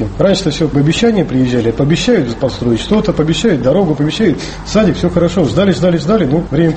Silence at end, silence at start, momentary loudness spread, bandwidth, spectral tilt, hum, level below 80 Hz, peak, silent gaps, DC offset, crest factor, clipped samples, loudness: 0 s; 0 s; 3 LU; 8.8 kHz; -6.5 dB/octave; none; -30 dBFS; 0 dBFS; none; under 0.1%; 12 dB; under 0.1%; -13 LUFS